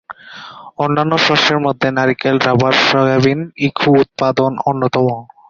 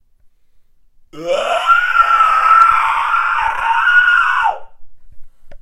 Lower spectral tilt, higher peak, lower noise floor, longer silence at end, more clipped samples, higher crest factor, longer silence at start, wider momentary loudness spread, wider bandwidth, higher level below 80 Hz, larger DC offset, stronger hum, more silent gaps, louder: first, -5.5 dB/octave vs -1.5 dB/octave; about the same, 0 dBFS vs 0 dBFS; second, -35 dBFS vs -49 dBFS; first, 0.25 s vs 0.05 s; neither; about the same, 14 dB vs 14 dB; second, 0.1 s vs 1.15 s; about the same, 9 LU vs 10 LU; second, 7.4 kHz vs 13 kHz; second, -52 dBFS vs -44 dBFS; neither; neither; neither; about the same, -14 LUFS vs -12 LUFS